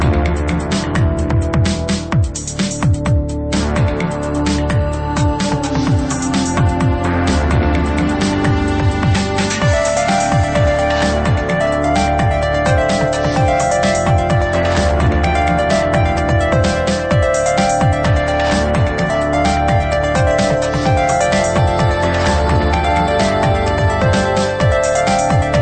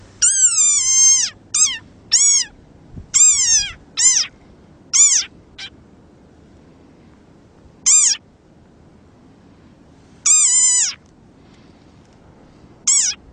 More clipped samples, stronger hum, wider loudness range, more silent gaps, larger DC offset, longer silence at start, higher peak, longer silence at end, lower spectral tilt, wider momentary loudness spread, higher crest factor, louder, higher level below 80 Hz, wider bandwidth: neither; neither; second, 3 LU vs 6 LU; neither; neither; second, 0 s vs 0.2 s; about the same, -2 dBFS vs -2 dBFS; second, 0 s vs 0.15 s; first, -5.5 dB/octave vs 2.5 dB/octave; second, 3 LU vs 15 LU; about the same, 12 dB vs 16 dB; second, -15 LUFS vs -12 LUFS; first, -24 dBFS vs -52 dBFS; second, 9.2 kHz vs 10.5 kHz